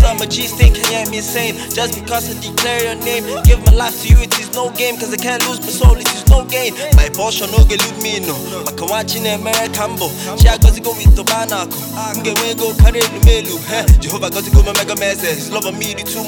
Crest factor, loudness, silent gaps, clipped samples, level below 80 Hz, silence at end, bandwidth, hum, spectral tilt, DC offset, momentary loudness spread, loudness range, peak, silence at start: 12 dB; -14 LUFS; none; 0.2%; -14 dBFS; 0 s; over 20 kHz; none; -4 dB/octave; under 0.1%; 8 LU; 2 LU; 0 dBFS; 0 s